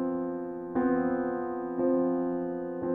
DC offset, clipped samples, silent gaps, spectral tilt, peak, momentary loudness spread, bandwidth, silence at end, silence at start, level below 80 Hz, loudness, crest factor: under 0.1%; under 0.1%; none; -11.5 dB/octave; -16 dBFS; 7 LU; 2.8 kHz; 0 s; 0 s; -62 dBFS; -30 LUFS; 14 dB